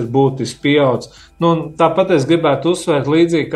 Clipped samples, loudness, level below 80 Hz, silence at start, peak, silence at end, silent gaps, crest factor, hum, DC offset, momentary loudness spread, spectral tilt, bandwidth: under 0.1%; -15 LUFS; -50 dBFS; 0 s; -2 dBFS; 0 s; none; 14 dB; none; under 0.1%; 4 LU; -6.5 dB/octave; 12 kHz